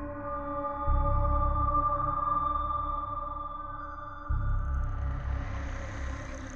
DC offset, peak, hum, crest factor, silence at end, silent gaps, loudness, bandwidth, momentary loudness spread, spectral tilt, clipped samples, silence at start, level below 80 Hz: 0.2%; -16 dBFS; none; 14 dB; 0 s; none; -32 LUFS; 7.2 kHz; 11 LU; -7.5 dB/octave; under 0.1%; 0 s; -34 dBFS